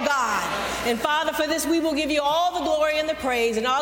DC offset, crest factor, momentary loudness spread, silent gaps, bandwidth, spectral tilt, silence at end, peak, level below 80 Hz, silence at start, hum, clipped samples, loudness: under 0.1%; 16 dB; 3 LU; none; 17 kHz; -2.5 dB/octave; 0 s; -8 dBFS; -50 dBFS; 0 s; none; under 0.1%; -23 LUFS